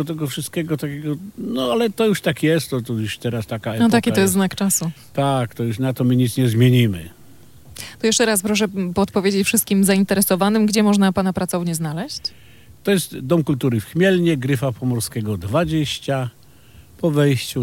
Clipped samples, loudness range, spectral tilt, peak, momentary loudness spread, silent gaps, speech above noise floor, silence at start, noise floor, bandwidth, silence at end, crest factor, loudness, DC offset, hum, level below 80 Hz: under 0.1%; 4 LU; -5 dB/octave; -2 dBFS; 10 LU; none; 29 dB; 0 s; -47 dBFS; 17 kHz; 0 s; 16 dB; -19 LUFS; under 0.1%; none; -52 dBFS